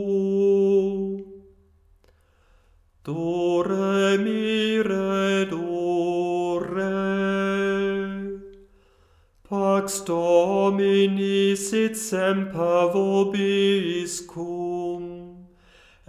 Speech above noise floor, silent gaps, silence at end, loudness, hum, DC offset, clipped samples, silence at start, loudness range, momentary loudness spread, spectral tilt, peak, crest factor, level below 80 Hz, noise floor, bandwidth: 36 dB; none; 0.65 s; -23 LUFS; none; under 0.1%; under 0.1%; 0 s; 5 LU; 11 LU; -5 dB/octave; -6 dBFS; 16 dB; -60 dBFS; -59 dBFS; 15.5 kHz